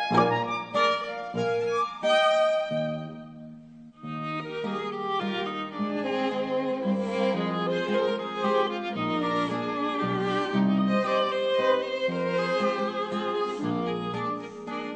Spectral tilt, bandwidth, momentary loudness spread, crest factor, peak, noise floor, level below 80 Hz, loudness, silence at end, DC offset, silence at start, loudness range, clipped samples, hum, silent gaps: -6 dB/octave; 9 kHz; 9 LU; 18 dB; -8 dBFS; -47 dBFS; -66 dBFS; -27 LUFS; 0 s; under 0.1%; 0 s; 5 LU; under 0.1%; none; none